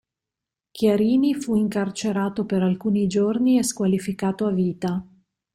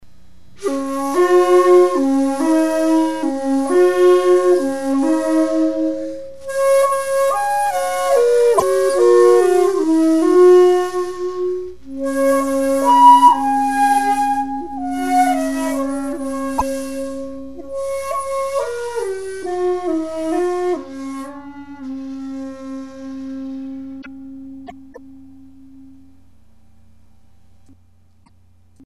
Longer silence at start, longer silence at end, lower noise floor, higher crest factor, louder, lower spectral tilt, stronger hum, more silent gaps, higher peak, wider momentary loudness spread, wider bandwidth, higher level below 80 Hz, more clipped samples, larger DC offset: first, 0.75 s vs 0 s; first, 0.5 s vs 0 s; first, -87 dBFS vs -54 dBFS; about the same, 14 dB vs 16 dB; second, -22 LUFS vs -16 LUFS; first, -6 dB/octave vs -4 dB/octave; neither; neither; second, -8 dBFS vs 0 dBFS; second, 6 LU vs 19 LU; first, 15.5 kHz vs 14 kHz; second, -58 dBFS vs -52 dBFS; neither; second, under 0.1% vs 2%